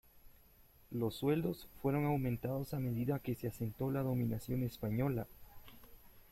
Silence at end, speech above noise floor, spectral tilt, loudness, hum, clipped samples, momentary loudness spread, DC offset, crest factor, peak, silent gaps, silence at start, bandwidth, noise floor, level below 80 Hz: 0.1 s; 27 dB; -8 dB/octave; -38 LUFS; none; under 0.1%; 8 LU; under 0.1%; 18 dB; -22 dBFS; none; 0.15 s; 16.5 kHz; -64 dBFS; -60 dBFS